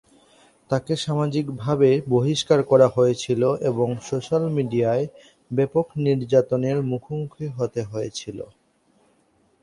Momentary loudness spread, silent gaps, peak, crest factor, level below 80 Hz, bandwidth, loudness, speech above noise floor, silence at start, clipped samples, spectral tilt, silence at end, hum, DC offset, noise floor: 12 LU; none; -4 dBFS; 20 dB; -60 dBFS; 11.5 kHz; -22 LUFS; 41 dB; 0.7 s; under 0.1%; -6.5 dB/octave; 1.15 s; none; under 0.1%; -63 dBFS